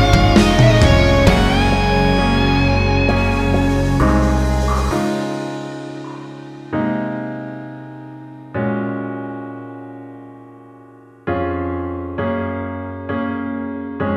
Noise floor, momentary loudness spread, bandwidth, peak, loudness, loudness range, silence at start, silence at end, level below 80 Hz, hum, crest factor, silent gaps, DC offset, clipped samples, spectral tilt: -43 dBFS; 20 LU; 15 kHz; 0 dBFS; -17 LUFS; 13 LU; 0 s; 0 s; -24 dBFS; none; 16 dB; none; under 0.1%; under 0.1%; -6.5 dB/octave